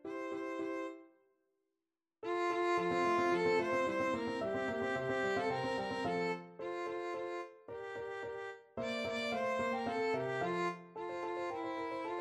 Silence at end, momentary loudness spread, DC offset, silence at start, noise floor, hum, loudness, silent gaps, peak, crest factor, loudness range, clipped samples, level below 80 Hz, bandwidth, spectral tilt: 0 s; 11 LU; under 0.1%; 0.05 s; under -90 dBFS; none; -37 LUFS; none; -22 dBFS; 16 dB; 6 LU; under 0.1%; -72 dBFS; 12 kHz; -5.5 dB/octave